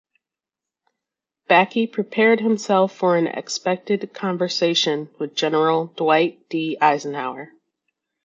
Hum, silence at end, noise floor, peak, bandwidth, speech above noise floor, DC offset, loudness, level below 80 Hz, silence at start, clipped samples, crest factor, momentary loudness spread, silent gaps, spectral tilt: none; 0.8 s; -88 dBFS; -2 dBFS; 7.8 kHz; 68 dB; under 0.1%; -20 LUFS; -78 dBFS; 1.5 s; under 0.1%; 20 dB; 9 LU; none; -4.5 dB/octave